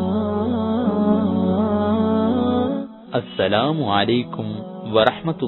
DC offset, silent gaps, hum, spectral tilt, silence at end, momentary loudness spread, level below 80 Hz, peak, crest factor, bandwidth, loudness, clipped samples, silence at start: under 0.1%; none; none; -9.5 dB/octave; 0 s; 9 LU; -44 dBFS; 0 dBFS; 20 dB; 4.2 kHz; -20 LUFS; under 0.1%; 0 s